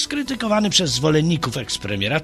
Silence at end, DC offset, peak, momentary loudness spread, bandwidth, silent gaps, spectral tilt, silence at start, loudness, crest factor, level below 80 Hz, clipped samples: 0 s; under 0.1%; -2 dBFS; 7 LU; 13.5 kHz; none; -4 dB/octave; 0 s; -19 LUFS; 18 dB; -46 dBFS; under 0.1%